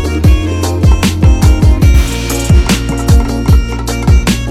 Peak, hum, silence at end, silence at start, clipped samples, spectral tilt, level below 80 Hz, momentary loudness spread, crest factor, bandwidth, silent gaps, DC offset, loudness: 0 dBFS; none; 0 s; 0 s; 0.2%; -6 dB/octave; -12 dBFS; 6 LU; 8 dB; 15 kHz; none; under 0.1%; -11 LUFS